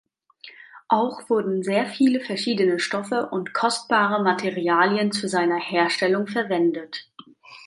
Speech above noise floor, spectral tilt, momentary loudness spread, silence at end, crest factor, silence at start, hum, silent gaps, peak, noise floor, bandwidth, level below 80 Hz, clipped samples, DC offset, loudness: 26 dB; -4.5 dB/octave; 6 LU; 0 s; 18 dB; 0.45 s; none; none; -4 dBFS; -48 dBFS; 11.5 kHz; -74 dBFS; under 0.1%; under 0.1%; -22 LUFS